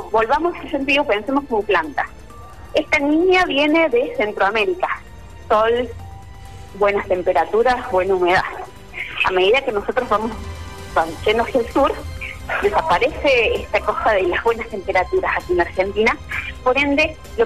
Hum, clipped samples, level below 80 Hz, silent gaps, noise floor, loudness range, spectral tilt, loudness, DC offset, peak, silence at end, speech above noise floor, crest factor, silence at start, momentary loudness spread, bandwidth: none; under 0.1%; -40 dBFS; none; -38 dBFS; 2 LU; -5 dB/octave; -18 LUFS; 0.8%; -6 dBFS; 0 s; 20 dB; 12 dB; 0 s; 13 LU; 14 kHz